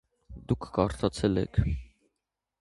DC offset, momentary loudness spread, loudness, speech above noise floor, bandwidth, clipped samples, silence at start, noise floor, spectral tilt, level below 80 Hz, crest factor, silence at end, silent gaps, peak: under 0.1%; 8 LU; -30 LUFS; 57 dB; 11.5 kHz; under 0.1%; 0.3 s; -85 dBFS; -7 dB/octave; -40 dBFS; 22 dB; 0.75 s; none; -8 dBFS